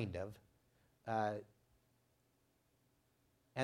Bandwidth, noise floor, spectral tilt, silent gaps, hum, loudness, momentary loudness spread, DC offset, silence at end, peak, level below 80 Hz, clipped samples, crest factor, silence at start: 16.5 kHz; -78 dBFS; -6.5 dB/octave; none; none; -44 LUFS; 14 LU; under 0.1%; 0 s; -22 dBFS; -78 dBFS; under 0.1%; 24 dB; 0 s